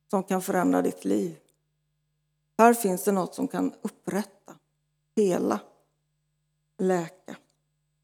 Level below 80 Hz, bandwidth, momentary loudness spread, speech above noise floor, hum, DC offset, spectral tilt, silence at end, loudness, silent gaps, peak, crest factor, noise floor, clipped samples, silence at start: -82 dBFS; over 20 kHz; 16 LU; 50 dB; none; under 0.1%; -6 dB/octave; 0.65 s; -26 LUFS; none; -4 dBFS; 24 dB; -76 dBFS; under 0.1%; 0.1 s